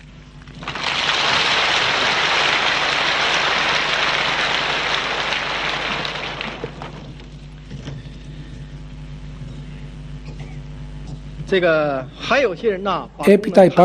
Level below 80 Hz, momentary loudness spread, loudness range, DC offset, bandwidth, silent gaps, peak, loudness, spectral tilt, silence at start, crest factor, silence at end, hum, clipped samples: -40 dBFS; 20 LU; 19 LU; under 0.1%; 14.5 kHz; none; 0 dBFS; -17 LUFS; -3.5 dB/octave; 0 s; 20 dB; 0 s; none; under 0.1%